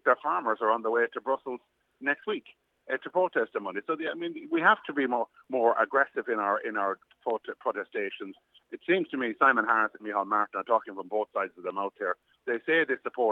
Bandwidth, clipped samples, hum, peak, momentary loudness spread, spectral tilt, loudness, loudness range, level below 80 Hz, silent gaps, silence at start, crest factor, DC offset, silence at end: 7 kHz; under 0.1%; none; -8 dBFS; 11 LU; -6.5 dB/octave; -29 LUFS; 4 LU; -86 dBFS; none; 0.05 s; 22 dB; under 0.1%; 0 s